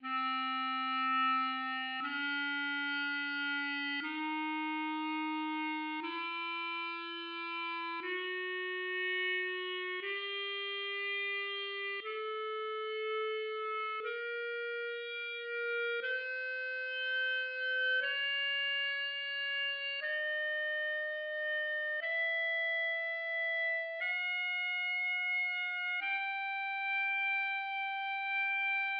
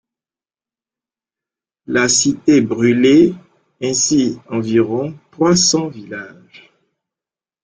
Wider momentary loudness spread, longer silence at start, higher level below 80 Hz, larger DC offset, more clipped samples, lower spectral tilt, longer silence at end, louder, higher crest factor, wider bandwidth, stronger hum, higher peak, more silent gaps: second, 6 LU vs 16 LU; second, 0 s vs 1.9 s; second, under -90 dBFS vs -54 dBFS; neither; neither; second, 4.5 dB/octave vs -3.5 dB/octave; second, 0 s vs 1.35 s; second, -35 LUFS vs -14 LUFS; about the same, 12 dB vs 16 dB; second, 6 kHz vs 10 kHz; neither; second, -24 dBFS vs -2 dBFS; neither